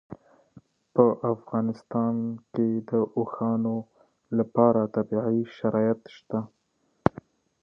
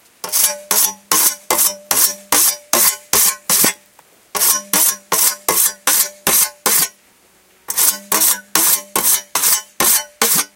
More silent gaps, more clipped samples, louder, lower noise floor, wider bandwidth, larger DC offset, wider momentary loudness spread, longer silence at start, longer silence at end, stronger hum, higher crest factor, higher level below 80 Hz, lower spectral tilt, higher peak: neither; neither; second, -27 LUFS vs -13 LUFS; first, -71 dBFS vs -52 dBFS; second, 5.8 kHz vs over 20 kHz; neither; first, 11 LU vs 2 LU; second, 0.1 s vs 0.25 s; first, 1.15 s vs 0.1 s; neither; first, 26 dB vs 16 dB; about the same, -60 dBFS vs -56 dBFS; first, -10.5 dB/octave vs 0.5 dB/octave; about the same, 0 dBFS vs 0 dBFS